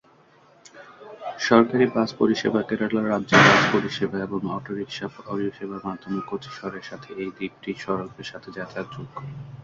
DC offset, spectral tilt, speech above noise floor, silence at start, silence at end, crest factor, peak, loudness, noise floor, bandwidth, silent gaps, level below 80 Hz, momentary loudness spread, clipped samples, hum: under 0.1%; -5 dB/octave; 32 dB; 0.75 s; 0 s; 22 dB; -2 dBFS; -23 LUFS; -56 dBFS; 7.6 kHz; none; -60 dBFS; 19 LU; under 0.1%; none